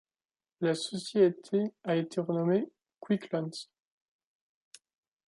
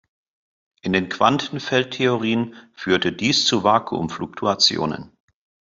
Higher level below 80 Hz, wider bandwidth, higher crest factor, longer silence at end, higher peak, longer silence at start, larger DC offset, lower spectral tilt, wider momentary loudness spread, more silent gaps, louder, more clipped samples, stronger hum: second, -80 dBFS vs -58 dBFS; first, 11.5 kHz vs 7.8 kHz; about the same, 20 dB vs 20 dB; first, 1.65 s vs 0.7 s; second, -12 dBFS vs -2 dBFS; second, 0.6 s vs 0.85 s; neither; first, -6 dB/octave vs -4 dB/octave; about the same, 12 LU vs 11 LU; neither; second, -31 LUFS vs -20 LUFS; neither; neither